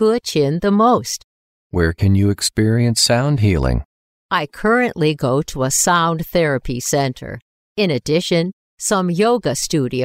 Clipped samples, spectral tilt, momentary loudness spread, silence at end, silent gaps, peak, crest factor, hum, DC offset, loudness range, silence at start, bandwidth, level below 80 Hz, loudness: under 0.1%; -4.5 dB/octave; 10 LU; 0 s; 1.24-1.70 s, 3.85-4.29 s, 7.42-7.75 s, 8.53-8.78 s; -2 dBFS; 14 dB; none; under 0.1%; 3 LU; 0 s; 16 kHz; -34 dBFS; -17 LUFS